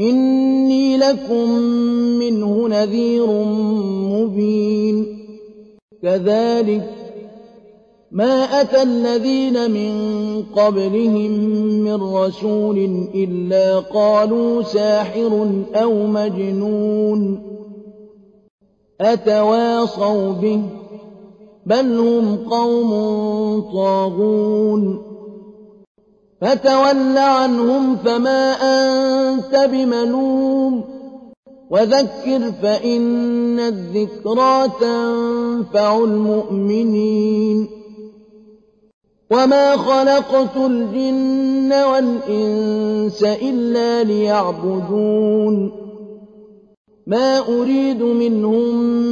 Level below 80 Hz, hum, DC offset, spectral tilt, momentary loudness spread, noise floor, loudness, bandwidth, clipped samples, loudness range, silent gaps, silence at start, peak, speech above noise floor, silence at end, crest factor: -58 dBFS; none; under 0.1%; -6.5 dB/octave; 7 LU; -49 dBFS; -17 LUFS; 7.4 kHz; under 0.1%; 4 LU; 5.82-5.88 s, 18.50-18.58 s, 25.87-25.95 s, 31.37-31.43 s, 38.93-39.01 s, 46.77-46.85 s; 0 s; -4 dBFS; 34 dB; 0 s; 12 dB